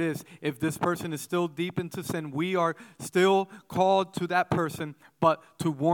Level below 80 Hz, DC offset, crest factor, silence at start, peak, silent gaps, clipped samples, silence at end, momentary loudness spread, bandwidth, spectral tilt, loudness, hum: -66 dBFS; under 0.1%; 18 dB; 0 s; -10 dBFS; none; under 0.1%; 0 s; 9 LU; 18 kHz; -5.5 dB/octave; -28 LUFS; none